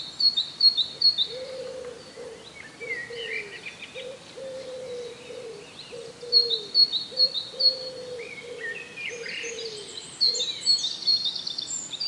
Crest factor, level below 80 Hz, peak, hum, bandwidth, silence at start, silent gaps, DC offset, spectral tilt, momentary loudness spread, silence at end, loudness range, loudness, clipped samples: 20 dB; -70 dBFS; -8 dBFS; none; 11.5 kHz; 0 s; none; under 0.1%; 0 dB/octave; 21 LU; 0 s; 13 LU; -23 LUFS; under 0.1%